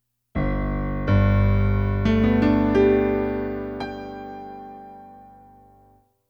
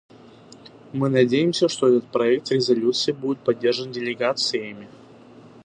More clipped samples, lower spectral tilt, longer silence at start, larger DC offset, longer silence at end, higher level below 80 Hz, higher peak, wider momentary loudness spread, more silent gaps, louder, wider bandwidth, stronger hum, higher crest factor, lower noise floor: neither; first, -9.5 dB/octave vs -5 dB/octave; second, 0.35 s vs 0.65 s; neither; first, 1.05 s vs 0.75 s; first, -32 dBFS vs -70 dBFS; about the same, -6 dBFS vs -4 dBFS; first, 19 LU vs 9 LU; neither; about the same, -22 LUFS vs -21 LUFS; first, over 20 kHz vs 9.6 kHz; first, 50 Hz at -35 dBFS vs none; about the same, 16 dB vs 18 dB; first, -58 dBFS vs -47 dBFS